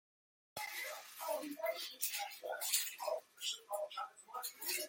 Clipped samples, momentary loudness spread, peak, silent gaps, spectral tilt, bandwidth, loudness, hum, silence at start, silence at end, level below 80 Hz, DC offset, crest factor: under 0.1%; 10 LU; -16 dBFS; none; 1 dB/octave; 17 kHz; -41 LUFS; none; 0.55 s; 0 s; under -90 dBFS; under 0.1%; 28 dB